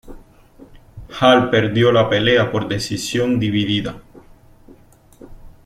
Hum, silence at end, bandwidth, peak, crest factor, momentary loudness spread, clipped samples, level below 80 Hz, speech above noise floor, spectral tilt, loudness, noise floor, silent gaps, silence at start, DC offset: none; 0.15 s; 15 kHz; -2 dBFS; 18 dB; 9 LU; under 0.1%; -44 dBFS; 31 dB; -5.5 dB/octave; -16 LUFS; -47 dBFS; none; 0.05 s; under 0.1%